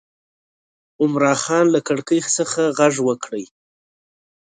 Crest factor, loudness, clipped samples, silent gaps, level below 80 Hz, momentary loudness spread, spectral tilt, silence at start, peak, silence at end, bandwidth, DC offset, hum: 18 dB; -18 LUFS; under 0.1%; none; -68 dBFS; 7 LU; -4 dB/octave; 1 s; -4 dBFS; 0.95 s; 9.6 kHz; under 0.1%; none